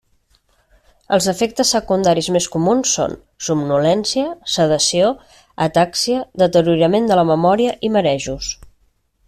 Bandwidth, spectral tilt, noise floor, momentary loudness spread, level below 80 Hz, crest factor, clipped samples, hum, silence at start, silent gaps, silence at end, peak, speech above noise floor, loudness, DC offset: 14.5 kHz; -4 dB/octave; -60 dBFS; 8 LU; -48 dBFS; 14 dB; under 0.1%; none; 1.1 s; none; 0.75 s; -4 dBFS; 44 dB; -16 LUFS; under 0.1%